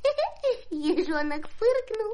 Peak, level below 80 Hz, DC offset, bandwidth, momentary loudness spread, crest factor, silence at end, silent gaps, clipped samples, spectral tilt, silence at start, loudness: -14 dBFS; -50 dBFS; under 0.1%; 10.5 kHz; 4 LU; 14 dB; 0 s; none; under 0.1%; -4.5 dB/octave; 0 s; -28 LUFS